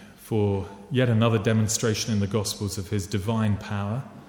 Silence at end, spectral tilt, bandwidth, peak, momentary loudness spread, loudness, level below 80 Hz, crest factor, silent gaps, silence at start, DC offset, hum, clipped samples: 0.05 s; -5.5 dB/octave; 17.5 kHz; -8 dBFS; 8 LU; -25 LUFS; -54 dBFS; 16 dB; none; 0 s; under 0.1%; none; under 0.1%